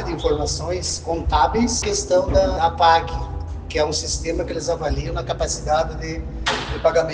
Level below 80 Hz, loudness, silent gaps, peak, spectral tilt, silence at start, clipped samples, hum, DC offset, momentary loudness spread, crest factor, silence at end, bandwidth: -30 dBFS; -21 LUFS; none; -4 dBFS; -4 dB/octave; 0 s; under 0.1%; none; under 0.1%; 9 LU; 18 dB; 0 s; 10 kHz